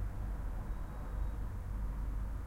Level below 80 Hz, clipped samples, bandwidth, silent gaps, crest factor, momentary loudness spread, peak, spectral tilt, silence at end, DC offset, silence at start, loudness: -40 dBFS; under 0.1%; 13 kHz; none; 10 dB; 3 LU; -28 dBFS; -7.5 dB/octave; 0 s; under 0.1%; 0 s; -43 LUFS